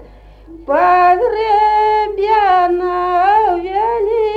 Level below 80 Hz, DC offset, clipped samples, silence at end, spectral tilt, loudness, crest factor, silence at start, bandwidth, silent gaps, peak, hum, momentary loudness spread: -42 dBFS; under 0.1%; under 0.1%; 0 s; -5.5 dB/octave; -13 LUFS; 12 dB; 0 s; 7.6 kHz; none; -2 dBFS; 50 Hz at -40 dBFS; 6 LU